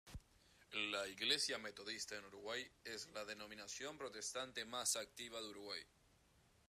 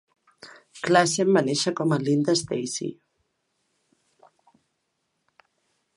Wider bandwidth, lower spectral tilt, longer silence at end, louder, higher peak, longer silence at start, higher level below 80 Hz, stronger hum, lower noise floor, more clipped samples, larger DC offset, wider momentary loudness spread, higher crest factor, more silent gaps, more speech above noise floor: first, 15 kHz vs 11.5 kHz; second, -0.5 dB/octave vs -4.5 dB/octave; second, 0.3 s vs 3.05 s; second, -45 LUFS vs -23 LUFS; second, -24 dBFS vs -4 dBFS; second, 0.05 s vs 0.45 s; about the same, -72 dBFS vs -70 dBFS; neither; about the same, -74 dBFS vs -76 dBFS; neither; neither; about the same, 12 LU vs 13 LU; about the same, 24 dB vs 24 dB; neither; second, 27 dB vs 54 dB